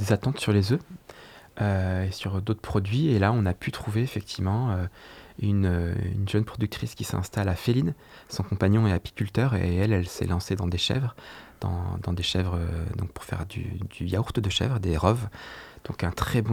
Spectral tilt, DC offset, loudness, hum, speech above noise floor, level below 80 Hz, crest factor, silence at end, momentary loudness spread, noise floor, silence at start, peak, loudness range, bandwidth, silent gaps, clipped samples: -6.5 dB/octave; under 0.1%; -27 LUFS; none; 22 dB; -46 dBFS; 22 dB; 0 s; 12 LU; -48 dBFS; 0 s; -6 dBFS; 3 LU; 15 kHz; none; under 0.1%